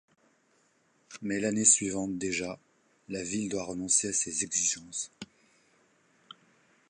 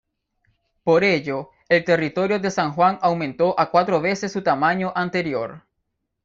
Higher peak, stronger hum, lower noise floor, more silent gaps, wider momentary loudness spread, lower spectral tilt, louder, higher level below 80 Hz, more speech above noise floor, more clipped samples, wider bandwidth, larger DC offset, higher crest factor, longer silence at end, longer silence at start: second, -8 dBFS vs -2 dBFS; neither; second, -69 dBFS vs -76 dBFS; neither; first, 19 LU vs 8 LU; second, -2.5 dB/octave vs -6 dB/octave; second, -28 LUFS vs -21 LUFS; second, -66 dBFS vs -60 dBFS; second, 39 dB vs 56 dB; neither; first, 11.5 kHz vs 7.6 kHz; neither; first, 26 dB vs 18 dB; first, 1.65 s vs 0.65 s; first, 1.1 s vs 0.85 s